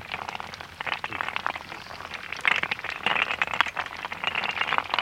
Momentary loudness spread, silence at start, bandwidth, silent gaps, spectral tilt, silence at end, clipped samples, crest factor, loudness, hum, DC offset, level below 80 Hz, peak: 12 LU; 0 s; 16 kHz; none; -2 dB/octave; 0 s; under 0.1%; 30 dB; -27 LUFS; none; under 0.1%; -60 dBFS; 0 dBFS